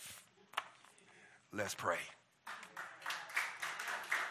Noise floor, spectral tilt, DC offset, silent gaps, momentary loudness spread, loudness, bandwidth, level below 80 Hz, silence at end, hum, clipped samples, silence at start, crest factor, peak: -64 dBFS; -1.5 dB/octave; under 0.1%; none; 23 LU; -42 LUFS; 16 kHz; -80 dBFS; 0 s; none; under 0.1%; 0 s; 24 dB; -20 dBFS